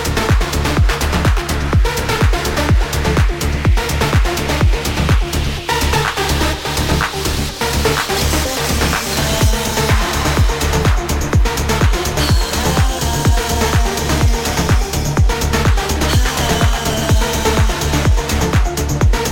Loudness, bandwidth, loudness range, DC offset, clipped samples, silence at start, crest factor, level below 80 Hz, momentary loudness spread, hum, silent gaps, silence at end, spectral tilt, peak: -16 LUFS; 17 kHz; 1 LU; under 0.1%; under 0.1%; 0 s; 12 dB; -18 dBFS; 2 LU; none; none; 0 s; -4.5 dB/octave; -2 dBFS